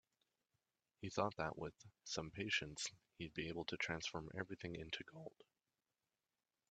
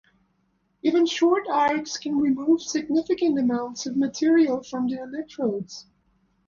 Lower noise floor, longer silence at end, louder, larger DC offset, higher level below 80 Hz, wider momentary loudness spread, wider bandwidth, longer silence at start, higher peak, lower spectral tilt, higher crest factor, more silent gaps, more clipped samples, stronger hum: first, under -90 dBFS vs -69 dBFS; first, 1.4 s vs 0.65 s; second, -46 LUFS vs -24 LUFS; neither; second, -72 dBFS vs -66 dBFS; first, 13 LU vs 8 LU; first, 8.8 kHz vs 7.4 kHz; first, 1 s vs 0.85 s; second, -24 dBFS vs -10 dBFS; about the same, -3.5 dB/octave vs -4.5 dB/octave; first, 26 dB vs 14 dB; neither; neither; neither